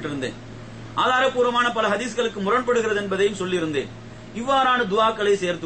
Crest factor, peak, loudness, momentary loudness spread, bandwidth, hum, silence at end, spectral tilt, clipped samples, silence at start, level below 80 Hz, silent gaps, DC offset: 14 dB; -8 dBFS; -22 LUFS; 16 LU; 8.8 kHz; none; 0 s; -4 dB/octave; under 0.1%; 0 s; -50 dBFS; none; under 0.1%